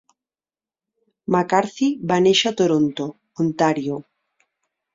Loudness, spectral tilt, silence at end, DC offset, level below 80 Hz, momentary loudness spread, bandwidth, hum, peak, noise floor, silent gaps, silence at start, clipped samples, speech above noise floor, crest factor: -20 LUFS; -5 dB/octave; 0.95 s; under 0.1%; -64 dBFS; 14 LU; 7.8 kHz; none; -2 dBFS; under -90 dBFS; none; 1.3 s; under 0.1%; over 71 dB; 20 dB